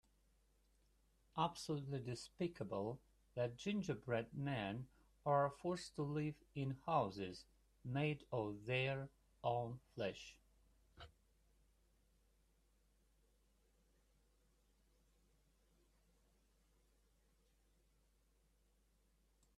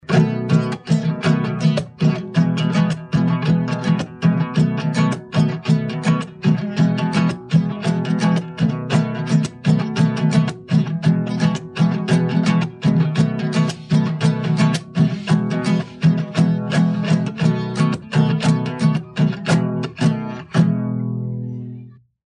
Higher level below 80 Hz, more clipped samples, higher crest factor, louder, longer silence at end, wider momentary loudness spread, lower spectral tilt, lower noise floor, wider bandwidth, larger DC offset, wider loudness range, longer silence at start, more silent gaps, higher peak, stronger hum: second, -74 dBFS vs -54 dBFS; neither; first, 22 dB vs 16 dB; second, -44 LUFS vs -19 LUFS; first, 8.5 s vs 0.35 s; first, 16 LU vs 3 LU; about the same, -6.5 dB/octave vs -7 dB/octave; first, -77 dBFS vs -39 dBFS; first, 13 kHz vs 10 kHz; neither; first, 7 LU vs 1 LU; first, 1.35 s vs 0.1 s; neither; second, -24 dBFS vs -2 dBFS; neither